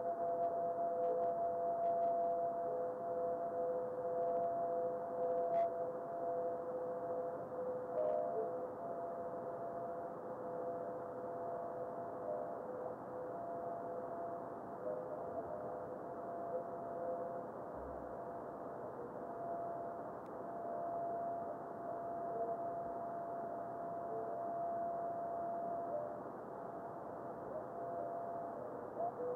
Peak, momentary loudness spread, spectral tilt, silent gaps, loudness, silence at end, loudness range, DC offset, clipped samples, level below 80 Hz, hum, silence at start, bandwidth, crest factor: -28 dBFS; 9 LU; -9 dB/octave; none; -42 LUFS; 0 s; 7 LU; under 0.1%; under 0.1%; -76 dBFS; none; 0 s; 3.6 kHz; 14 dB